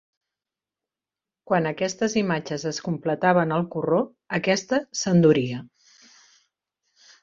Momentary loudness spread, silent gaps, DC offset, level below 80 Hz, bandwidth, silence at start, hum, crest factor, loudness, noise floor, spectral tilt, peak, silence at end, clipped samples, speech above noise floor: 9 LU; none; under 0.1%; -66 dBFS; 7.6 kHz; 1.5 s; none; 20 dB; -23 LUFS; -90 dBFS; -5.5 dB/octave; -4 dBFS; 1.55 s; under 0.1%; 67 dB